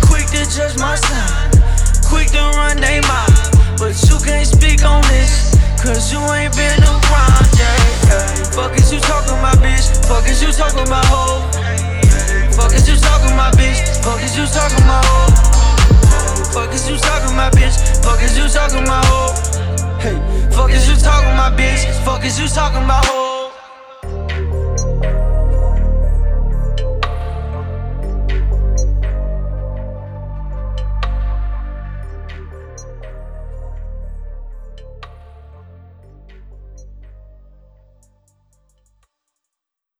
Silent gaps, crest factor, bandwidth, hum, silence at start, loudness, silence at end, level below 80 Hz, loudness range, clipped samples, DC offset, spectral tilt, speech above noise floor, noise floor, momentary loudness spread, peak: none; 12 dB; 13.5 kHz; none; 0 s; -14 LUFS; 3 s; -14 dBFS; 14 LU; under 0.1%; under 0.1%; -4.5 dB/octave; 72 dB; -83 dBFS; 17 LU; 0 dBFS